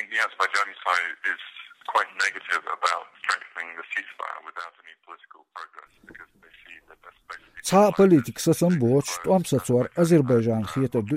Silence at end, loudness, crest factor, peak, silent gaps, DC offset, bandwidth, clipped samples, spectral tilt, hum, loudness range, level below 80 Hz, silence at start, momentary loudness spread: 0 s; -23 LUFS; 18 dB; -6 dBFS; none; under 0.1%; 15.5 kHz; under 0.1%; -5.5 dB/octave; none; 16 LU; -62 dBFS; 0 s; 22 LU